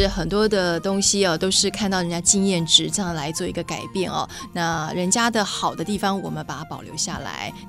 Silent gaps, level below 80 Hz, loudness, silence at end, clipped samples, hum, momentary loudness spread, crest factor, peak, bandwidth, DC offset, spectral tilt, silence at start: none; -42 dBFS; -21 LUFS; 0 s; under 0.1%; none; 12 LU; 22 dB; 0 dBFS; 16 kHz; under 0.1%; -3 dB/octave; 0 s